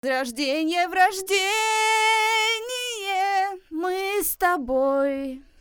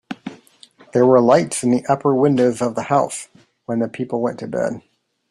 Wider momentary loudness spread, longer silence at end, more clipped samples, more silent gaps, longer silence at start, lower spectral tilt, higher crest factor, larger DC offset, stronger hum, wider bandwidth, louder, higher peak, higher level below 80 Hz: second, 9 LU vs 19 LU; second, 0.2 s vs 0.5 s; neither; neither; about the same, 0.05 s vs 0.1 s; second, -0.5 dB/octave vs -6 dB/octave; about the same, 18 dB vs 18 dB; neither; neither; first, over 20 kHz vs 13 kHz; second, -22 LUFS vs -18 LUFS; second, -6 dBFS vs -2 dBFS; first, -56 dBFS vs -62 dBFS